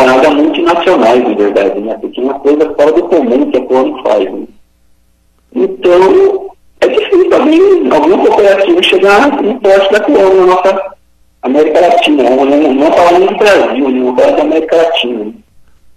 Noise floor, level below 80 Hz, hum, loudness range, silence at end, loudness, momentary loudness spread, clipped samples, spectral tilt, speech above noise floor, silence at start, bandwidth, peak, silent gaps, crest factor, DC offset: -50 dBFS; -46 dBFS; none; 4 LU; 0.65 s; -8 LUFS; 9 LU; under 0.1%; -4.5 dB/octave; 43 dB; 0 s; 13 kHz; 0 dBFS; none; 8 dB; under 0.1%